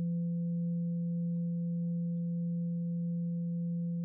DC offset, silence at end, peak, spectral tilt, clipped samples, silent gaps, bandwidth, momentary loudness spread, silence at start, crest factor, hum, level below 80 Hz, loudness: under 0.1%; 0 s; -28 dBFS; -22.5 dB/octave; under 0.1%; none; 0.5 kHz; 1 LU; 0 s; 4 dB; none; -80 dBFS; -35 LUFS